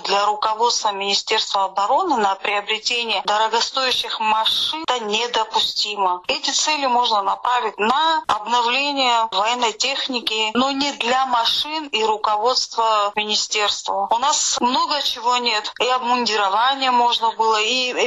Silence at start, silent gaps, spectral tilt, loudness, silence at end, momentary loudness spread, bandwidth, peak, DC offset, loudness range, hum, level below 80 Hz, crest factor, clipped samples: 0 s; none; -0.5 dB/octave; -18 LUFS; 0 s; 3 LU; 13.5 kHz; -6 dBFS; under 0.1%; 1 LU; none; -62 dBFS; 14 dB; under 0.1%